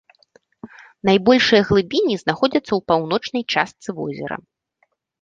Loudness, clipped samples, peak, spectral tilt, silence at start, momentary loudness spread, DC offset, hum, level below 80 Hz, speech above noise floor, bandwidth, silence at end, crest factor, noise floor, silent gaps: -19 LUFS; under 0.1%; -2 dBFS; -5.5 dB/octave; 0.65 s; 14 LU; under 0.1%; none; -50 dBFS; 49 dB; 7.6 kHz; 0.85 s; 18 dB; -67 dBFS; none